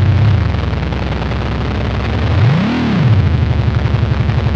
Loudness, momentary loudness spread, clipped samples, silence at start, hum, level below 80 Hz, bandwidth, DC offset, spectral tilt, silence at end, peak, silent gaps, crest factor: -15 LUFS; 6 LU; under 0.1%; 0 s; none; -22 dBFS; 7 kHz; under 0.1%; -8 dB/octave; 0 s; 0 dBFS; none; 12 dB